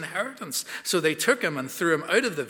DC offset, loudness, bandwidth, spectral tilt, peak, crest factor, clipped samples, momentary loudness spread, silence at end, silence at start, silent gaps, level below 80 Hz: under 0.1%; -25 LUFS; 19.5 kHz; -3 dB/octave; -6 dBFS; 20 dB; under 0.1%; 8 LU; 0 s; 0 s; none; -78 dBFS